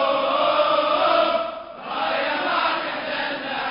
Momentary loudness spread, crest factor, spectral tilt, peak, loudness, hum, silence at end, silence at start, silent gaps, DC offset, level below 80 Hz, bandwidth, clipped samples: 8 LU; 16 dB; -7.5 dB/octave; -6 dBFS; -21 LUFS; none; 0 s; 0 s; none; under 0.1%; -60 dBFS; 5.4 kHz; under 0.1%